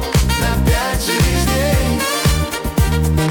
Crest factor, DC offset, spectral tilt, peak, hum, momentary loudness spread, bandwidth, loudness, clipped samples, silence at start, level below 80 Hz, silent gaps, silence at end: 12 dB; under 0.1%; -4.5 dB/octave; -4 dBFS; none; 2 LU; 18 kHz; -16 LUFS; under 0.1%; 0 s; -20 dBFS; none; 0 s